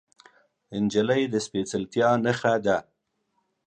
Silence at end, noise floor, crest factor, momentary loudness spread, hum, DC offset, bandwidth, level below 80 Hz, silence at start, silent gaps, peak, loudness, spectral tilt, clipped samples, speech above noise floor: 0.85 s; -75 dBFS; 18 dB; 7 LU; none; under 0.1%; 10 kHz; -62 dBFS; 0.7 s; none; -8 dBFS; -25 LUFS; -5.5 dB/octave; under 0.1%; 50 dB